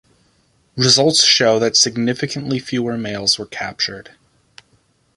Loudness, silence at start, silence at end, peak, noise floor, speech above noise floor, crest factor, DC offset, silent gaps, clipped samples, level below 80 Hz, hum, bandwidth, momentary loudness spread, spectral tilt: -15 LUFS; 0.75 s; 1.15 s; 0 dBFS; -59 dBFS; 42 dB; 18 dB; under 0.1%; none; under 0.1%; -56 dBFS; none; 11.5 kHz; 12 LU; -2.5 dB/octave